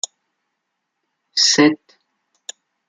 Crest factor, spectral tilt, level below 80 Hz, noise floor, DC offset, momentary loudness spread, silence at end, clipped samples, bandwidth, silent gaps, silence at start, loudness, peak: 20 dB; -2 dB/octave; -68 dBFS; -76 dBFS; under 0.1%; 24 LU; 1.15 s; under 0.1%; 9.6 kHz; none; 1.35 s; -15 LUFS; -2 dBFS